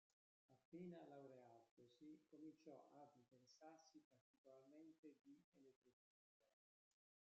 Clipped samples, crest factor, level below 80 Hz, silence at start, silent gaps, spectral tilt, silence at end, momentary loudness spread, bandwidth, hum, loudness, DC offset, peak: under 0.1%; 18 dB; under -90 dBFS; 0.5 s; 0.65-0.72 s, 1.71-1.77 s, 4.04-4.11 s, 4.21-4.44 s, 4.98-5.03 s, 5.44-5.52 s, 5.76-5.82 s, 5.93-6.40 s; -6.5 dB/octave; 0.8 s; 9 LU; 7.4 kHz; none; -65 LUFS; under 0.1%; -50 dBFS